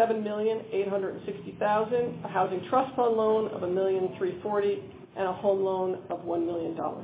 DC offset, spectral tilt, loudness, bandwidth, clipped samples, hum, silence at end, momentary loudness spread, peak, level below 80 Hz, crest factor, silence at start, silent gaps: under 0.1%; -10 dB/octave; -29 LUFS; 4 kHz; under 0.1%; none; 0 s; 7 LU; -12 dBFS; -66 dBFS; 18 dB; 0 s; none